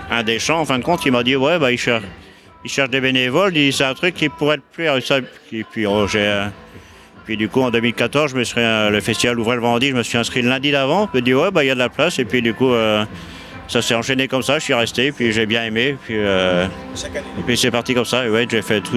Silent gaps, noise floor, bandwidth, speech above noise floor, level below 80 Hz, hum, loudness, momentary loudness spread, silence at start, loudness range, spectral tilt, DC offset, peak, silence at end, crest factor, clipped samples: none; -42 dBFS; 15 kHz; 24 dB; -48 dBFS; none; -17 LUFS; 8 LU; 0 s; 3 LU; -4 dB/octave; under 0.1%; 0 dBFS; 0 s; 18 dB; under 0.1%